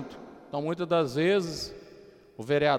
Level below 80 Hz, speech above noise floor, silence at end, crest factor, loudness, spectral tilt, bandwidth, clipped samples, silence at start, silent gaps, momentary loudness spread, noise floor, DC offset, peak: -60 dBFS; 25 dB; 0 s; 16 dB; -28 LUFS; -5.5 dB/octave; 15.5 kHz; under 0.1%; 0 s; none; 21 LU; -52 dBFS; under 0.1%; -12 dBFS